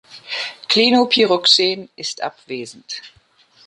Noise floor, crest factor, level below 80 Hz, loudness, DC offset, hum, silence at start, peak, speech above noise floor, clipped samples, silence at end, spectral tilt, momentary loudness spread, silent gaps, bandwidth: -53 dBFS; 18 dB; -68 dBFS; -16 LUFS; under 0.1%; none; 0.1 s; 0 dBFS; 35 dB; under 0.1%; 0.6 s; -2.5 dB/octave; 18 LU; none; 11 kHz